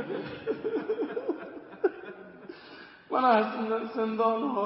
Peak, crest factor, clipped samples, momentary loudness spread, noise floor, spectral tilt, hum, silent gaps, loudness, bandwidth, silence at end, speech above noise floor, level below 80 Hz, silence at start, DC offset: -10 dBFS; 20 dB; under 0.1%; 22 LU; -49 dBFS; -9.5 dB/octave; none; none; -29 LUFS; 5.8 kHz; 0 s; 23 dB; -74 dBFS; 0 s; under 0.1%